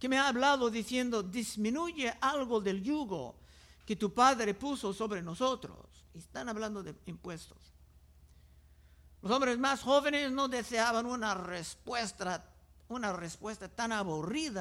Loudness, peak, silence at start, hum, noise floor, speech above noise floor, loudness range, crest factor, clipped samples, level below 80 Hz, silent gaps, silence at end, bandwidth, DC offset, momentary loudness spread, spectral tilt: -33 LUFS; -14 dBFS; 0 s; none; -60 dBFS; 27 dB; 9 LU; 20 dB; under 0.1%; -62 dBFS; none; 0 s; 16 kHz; under 0.1%; 16 LU; -4 dB/octave